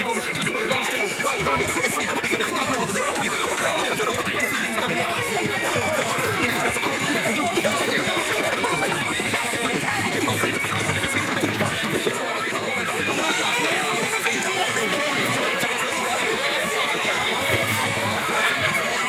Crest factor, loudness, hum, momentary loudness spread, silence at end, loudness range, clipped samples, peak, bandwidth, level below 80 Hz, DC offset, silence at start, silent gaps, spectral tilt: 18 dB; -21 LUFS; none; 2 LU; 0 s; 1 LU; under 0.1%; -6 dBFS; 18.5 kHz; -56 dBFS; under 0.1%; 0 s; none; -2.5 dB/octave